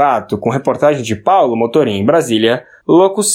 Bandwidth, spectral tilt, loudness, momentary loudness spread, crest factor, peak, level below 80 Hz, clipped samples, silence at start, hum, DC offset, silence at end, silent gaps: 16.5 kHz; -4.5 dB/octave; -13 LUFS; 5 LU; 12 dB; 0 dBFS; -56 dBFS; under 0.1%; 0 s; none; under 0.1%; 0 s; none